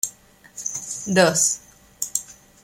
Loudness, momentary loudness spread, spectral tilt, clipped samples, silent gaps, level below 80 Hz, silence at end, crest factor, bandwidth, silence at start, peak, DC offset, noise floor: -22 LUFS; 14 LU; -2.5 dB/octave; under 0.1%; none; -62 dBFS; 0.3 s; 20 dB; 16.5 kHz; 0.05 s; -4 dBFS; under 0.1%; -49 dBFS